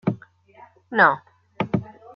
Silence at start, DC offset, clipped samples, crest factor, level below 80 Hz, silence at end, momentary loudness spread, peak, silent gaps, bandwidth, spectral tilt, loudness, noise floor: 0.05 s; under 0.1%; under 0.1%; 22 dB; -60 dBFS; 0.25 s; 14 LU; -2 dBFS; none; 6.2 kHz; -8.5 dB/octave; -22 LUFS; -51 dBFS